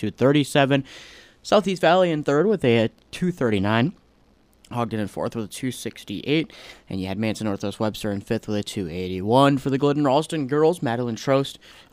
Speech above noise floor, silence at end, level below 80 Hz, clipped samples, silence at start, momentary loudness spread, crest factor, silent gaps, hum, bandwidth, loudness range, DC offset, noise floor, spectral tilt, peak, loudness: 36 dB; 0.4 s; -56 dBFS; under 0.1%; 0 s; 13 LU; 18 dB; none; none; 15.5 kHz; 6 LU; under 0.1%; -58 dBFS; -6 dB/octave; -4 dBFS; -22 LUFS